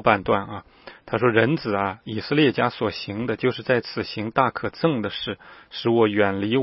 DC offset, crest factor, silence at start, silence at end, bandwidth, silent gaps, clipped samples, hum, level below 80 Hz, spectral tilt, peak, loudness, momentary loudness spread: under 0.1%; 22 dB; 0 s; 0 s; 5.8 kHz; none; under 0.1%; none; -56 dBFS; -10 dB/octave; -2 dBFS; -23 LUFS; 11 LU